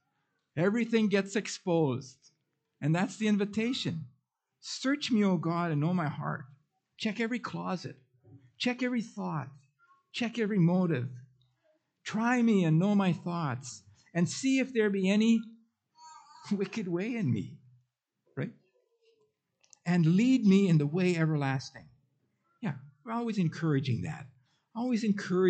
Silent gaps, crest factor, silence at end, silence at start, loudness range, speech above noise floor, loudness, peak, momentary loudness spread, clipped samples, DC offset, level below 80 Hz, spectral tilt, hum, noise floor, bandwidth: none; 16 dB; 0 s; 0.55 s; 7 LU; 50 dB; -30 LUFS; -14 dBFS; 16 LU; under 0.1%; under 0.1%; -76 dBFS; -6.5 dB/octave; none; -79 dBFS; 9 kHz